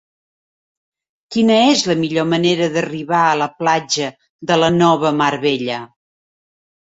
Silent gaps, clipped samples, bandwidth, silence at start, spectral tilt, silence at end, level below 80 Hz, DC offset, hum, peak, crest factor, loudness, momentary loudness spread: 4.29-4.39 s; under 0.1%; 8.2 kHz; 1.3 s; -4.5 dB/octave; 1.1 s; -58 dBFS; under 0.1%; none; -2 dBFS; 16 dB; -16 LUFS; 10 LU